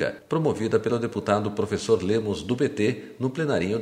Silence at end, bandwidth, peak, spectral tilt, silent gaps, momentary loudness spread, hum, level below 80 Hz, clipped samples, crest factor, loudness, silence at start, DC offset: 0 s; 11 kHz; -6 dBFS; -6.5 dB/octave; none; 4 LU; none; -56 dBFS; under 0.1%; 20 dB; -25 LUFS; 0 s; under 0.1%